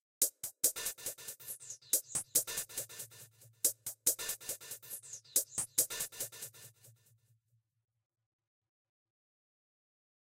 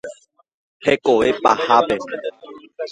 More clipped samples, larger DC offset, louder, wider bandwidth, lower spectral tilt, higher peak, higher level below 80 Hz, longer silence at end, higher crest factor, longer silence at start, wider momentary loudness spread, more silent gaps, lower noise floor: neither; neither; second, -35 LUFS vs -18 LUFS; first, 16.5 kHz vs 11 kHz; second, 0.5 dB/octave vs -4.5 dB/octave; second, -16 dBFS vs 0 dBFS; second, -76 dBFS vs -54 dBFS; first, 3.4 s vs 0 s; about the same, 24 dB vs 20 dB; first, 0.2 s vs 0.05 s; second, 13 LU vs 16 LU; second, none vs 0.54-0.80 s; first, -78 dBFS vs -42 dBFS